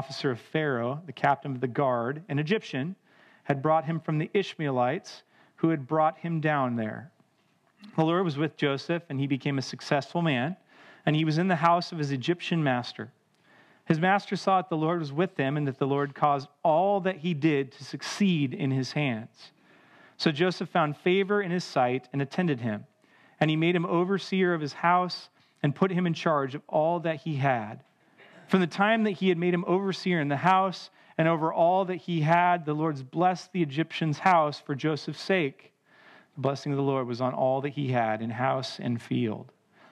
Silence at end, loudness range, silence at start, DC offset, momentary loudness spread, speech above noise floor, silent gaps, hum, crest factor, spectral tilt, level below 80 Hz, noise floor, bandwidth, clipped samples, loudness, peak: 0.45 s; 4 LU; 0 s; under 0.1%; 8 LU; 41 dB; none; none; 20 dB; -6.5 dB/octave; -82 dBFS; -68 dBFS; 10.5 kHz; under 0.1%; -27 LUFS; -6 dBFS